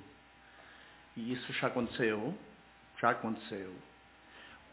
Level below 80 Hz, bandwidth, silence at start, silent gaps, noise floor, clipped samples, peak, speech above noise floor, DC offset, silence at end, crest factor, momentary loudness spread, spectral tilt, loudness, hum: -70 dBFS; 4 kHz; 0 s; none; -59 dBFS; under 0.1%; -14 dBFS; 24 dB; under 0.1%; 0 s; 26 dB; 24 LU; -3.5 dB/octave; -36 LUFS; none